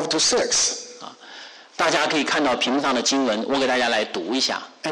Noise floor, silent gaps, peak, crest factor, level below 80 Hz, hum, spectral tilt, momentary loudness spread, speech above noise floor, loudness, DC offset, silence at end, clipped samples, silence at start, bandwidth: -42 dBFS; none; -10 dBFS; 12 dB; -60 dBFS; none; -1.5 dB/octave; 20 LU; 21 dB; -20 LUFS; under 0.1%; 0 s; under 0.1%; 0 s; 11.5 kHz